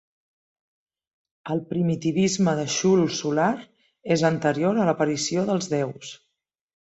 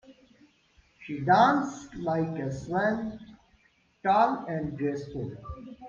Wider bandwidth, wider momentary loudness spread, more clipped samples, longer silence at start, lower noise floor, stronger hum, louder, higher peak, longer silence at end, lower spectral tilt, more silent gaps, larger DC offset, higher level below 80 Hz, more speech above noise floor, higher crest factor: first, 8.2 kHz vs 7.4 kHz; second, 11 LU vs 18 LU; neither; first, 1.45 s vs 0.1 s; first, -79 dBFS vs -65 dBFS; neither; first, -23 LUFS vs -28 LUFS; about the same, -8 dBFS vs -8 dBFS; first, 0.75 s vs 0 s; second, -5 dB/octave vs -6.5 dB/octave; neither; neither; second, -64 dBFS vs -56 dBFS; first, 56 dB vs 38 dB; about the same, 18 dB vs 20 dB